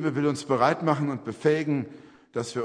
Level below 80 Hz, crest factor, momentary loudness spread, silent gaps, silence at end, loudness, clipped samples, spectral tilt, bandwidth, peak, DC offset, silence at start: -68 dBFS; 20 dB; 11 LU; none; 0 s; -26 LUFS; under 0.1%; -6.5 dB/octave; 10.5 kHz; -6 dBFS; under 0.1%; 0 s